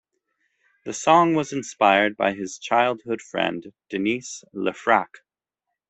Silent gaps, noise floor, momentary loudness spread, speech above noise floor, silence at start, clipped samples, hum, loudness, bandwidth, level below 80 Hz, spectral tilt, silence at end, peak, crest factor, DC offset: none; -83 dBFS; 15 LU; 61 dB; 0.85 s; under 0.1%; none; -22 LUFS; 8.4 kHz; -68 dBFS; -4 dB/octave; 0.85 s; -2 dBFS; 22 dB; under 0.1%